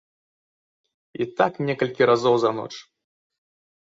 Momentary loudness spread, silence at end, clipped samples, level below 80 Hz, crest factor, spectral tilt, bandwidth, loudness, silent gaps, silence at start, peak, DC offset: 18 LU; 1.15 s; under 0.1%; -66 dBFS; 20 dB; -6 dB/octave; 7.8 kHz; -22 LUFS; none; 1.2 s; -4 dBFS; under 0.1%